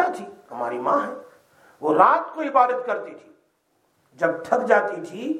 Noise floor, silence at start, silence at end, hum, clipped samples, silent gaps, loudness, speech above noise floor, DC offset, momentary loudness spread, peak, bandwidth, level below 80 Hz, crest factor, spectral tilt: -67 dBFS; 0 s; 0 s; none; under 0.1%; none; -22 LUFS; 46 dB; under 0.1%; 16 LU; -2 dBFS; 12.5 kHz; -80 dBFS; 22 dB; -6 dB/octave